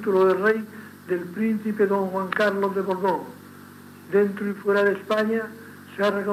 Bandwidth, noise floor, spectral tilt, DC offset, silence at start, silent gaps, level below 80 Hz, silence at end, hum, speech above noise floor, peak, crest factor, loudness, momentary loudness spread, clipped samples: 15.5 kHz; -44 dBFS; -6.5 dB/octave; under 0.1%; 0 s; none; -88 dBFS; 0 s; none; 22 dB; -8 dBFS; 16 dB; -24 LUFS; 18 LU; under 0.1%